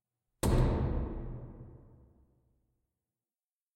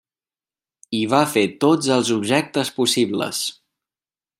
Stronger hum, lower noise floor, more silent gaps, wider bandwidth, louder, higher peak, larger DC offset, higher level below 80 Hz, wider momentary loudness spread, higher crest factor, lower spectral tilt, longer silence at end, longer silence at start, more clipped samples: neither; about the same, under -90 dBFS vs under -90 dBFS; neither; about the same, 16 kHz vs 16 kHz; second, -34 LUFS vs -20 LUFS; second, -16 dBFS vs -2 dBFS; neither; first, -40 dBFS vs -66 dBFS; first, 22 LU vs 7 LU; about the same, 20 dB vs 20 dB; first, -7 dB/octave vs -4 dB/octave; first, 2 s vs 0.85 s; second, 0.45 s vs 0.9 s; neither